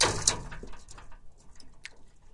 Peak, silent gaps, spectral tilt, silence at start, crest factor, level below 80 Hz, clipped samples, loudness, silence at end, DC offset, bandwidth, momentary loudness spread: -4 dBFS; none; -1.5 dB/octave; 0 s; 30 dB; -48 dBFS; under 0.1%; -27 LUFS; 0.05 s; under 0.1%; 11.5 kHz; 25 LU